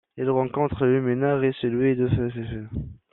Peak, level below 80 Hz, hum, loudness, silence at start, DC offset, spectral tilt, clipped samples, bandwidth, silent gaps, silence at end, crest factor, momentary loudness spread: -10 dBFS; -46 dBFS; none; -24 LUFS; 0.15 s; under 0.1%; -7.5 dB/octave; under 0.1%; 4.1 kHz; none; 0.2 s; 14 dB; 11 LU